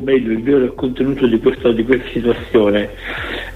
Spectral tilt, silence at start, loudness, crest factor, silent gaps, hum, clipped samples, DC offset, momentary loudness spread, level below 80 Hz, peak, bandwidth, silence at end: -7.5 dB/octave; 0 s; -16 LUFS; 14 dB; none; none; under 0.1%; under 0.1%; 8 LU; -36 dBFS; -2 dBFS; 9 kHz; 0 s